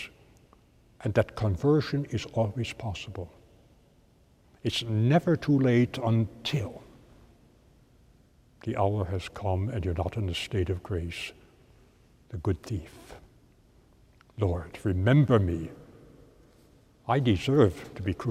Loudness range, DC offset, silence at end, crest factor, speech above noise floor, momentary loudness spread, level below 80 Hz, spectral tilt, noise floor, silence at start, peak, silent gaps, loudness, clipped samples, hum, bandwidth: 8 LU; under 0.1%; 0 s; 22 dB; 34 dB; 17 LU; -50 dBFS; -7 dB/octave; -61 dBFS; 0 s; -8 dBFS; none; -28 LUFS; under 0.1%; none; 13.5 kHz